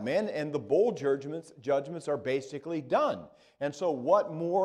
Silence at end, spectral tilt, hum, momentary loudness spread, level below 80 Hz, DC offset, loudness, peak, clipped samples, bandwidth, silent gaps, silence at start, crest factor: 0 s; -6.5 dB/octave; none; 10 LU; -74 dBFS; under 0.1%; -31 LUFS; -12 dBFS; under 0.1%; 10.5 kHz; none; 0 s; 18 dB